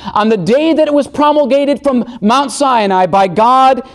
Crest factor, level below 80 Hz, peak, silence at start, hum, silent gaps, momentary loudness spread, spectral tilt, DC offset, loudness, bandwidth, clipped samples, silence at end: 10 dB; -48 dBFS; -2 dBFS; 0 s; none; none; 4 LU; -5 dB/octave; under 0.1%; -11 LUFS; 12.5 kHz; under 0.1%; 0.05 s